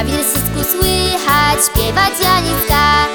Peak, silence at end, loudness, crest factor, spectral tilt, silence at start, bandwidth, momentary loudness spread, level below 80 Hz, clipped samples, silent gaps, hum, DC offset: 0 dBFS; 0 s; -12 LUFS; 14 dB; -3 dB/octave; 0 s; over 20 kHz; 4 LU; -24 dBFS; under 0.1%; none; none; under 0.1%